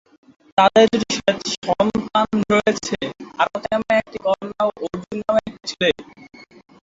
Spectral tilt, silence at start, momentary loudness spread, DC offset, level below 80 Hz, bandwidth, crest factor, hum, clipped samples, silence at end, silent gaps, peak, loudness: -4 dB/octave; 0.55 s; 12 LU; under 0.1%; -52 dBFS; 7.8 kHz; 18 dB; none; under 0.1%; 0.55 s; 1.58-1.62 s; -2 dBFS; -20 LUFS